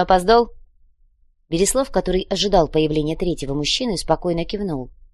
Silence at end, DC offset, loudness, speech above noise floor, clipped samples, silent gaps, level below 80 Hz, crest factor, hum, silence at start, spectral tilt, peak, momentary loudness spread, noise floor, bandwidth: 0.25 s; under 0.1%; -20 LUFS; 38 dB; under 0.1%; none; -34 dBFS; 20 dB; none; 0 s; -4.5 dB/octave; -2 dBFS; 9 LU; -57 dBFS; 13 kHz